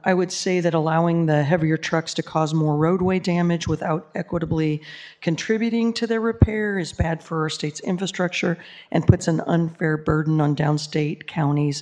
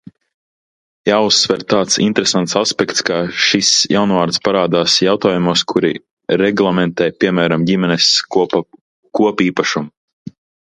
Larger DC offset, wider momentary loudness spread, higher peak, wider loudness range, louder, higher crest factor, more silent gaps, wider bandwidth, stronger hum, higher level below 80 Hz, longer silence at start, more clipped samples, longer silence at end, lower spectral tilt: neither; about the same, 7 LU vs 7 LU; about the same, 0 dBFS vs 0 dBFS; about the same, 2 LU vs 2 LU; second, -22 LUFS vs -14 LUFS; first, 22 dB vs 16 dB; second, none vs 6.11-6.17 s, 8.81-9.03 s, 9.97-10.26 s; about the same, 10 kHz vs 11 kHz; neither; first, -40 dBFS vs -54 dBFS; second, 0.05 s vs 1.05 s; neither; second, 0 s vs 0.4 s; first, -6.5 dB/octave vs -3.5 dB/octave